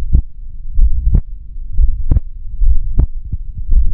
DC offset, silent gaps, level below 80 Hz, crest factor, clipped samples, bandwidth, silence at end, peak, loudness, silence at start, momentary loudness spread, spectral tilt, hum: under 0.1%; none; -12 dBFS; 12 dB; under 0.1%; 1 kHz; 0 s; 0 dBFS; -19 LUFS; 0 s; 16 LU; -13 dB/octave; none